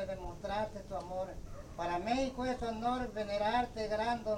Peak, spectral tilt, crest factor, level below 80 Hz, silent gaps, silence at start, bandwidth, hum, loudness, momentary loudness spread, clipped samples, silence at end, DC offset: -20 dBFS; -5.5 dB/octave; 16 dB; -50 dBFS; none; 0 s; 16.5 kHz; none; -37 LUFS; 9 LU; under 0.1%; 0 s; under 0.1%